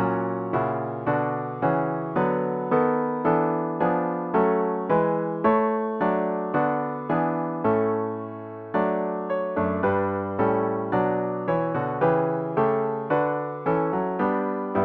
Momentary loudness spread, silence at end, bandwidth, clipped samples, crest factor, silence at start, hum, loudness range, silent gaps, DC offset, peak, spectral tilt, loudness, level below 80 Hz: 5 LU; 0 s; 4.6 kHz; under 0.1%; 16 dB; 0 s; none; 2 LU; none; under 0.1%; -8 dBFS; -11 dB/octave; -25 LUFS; -60 dBFS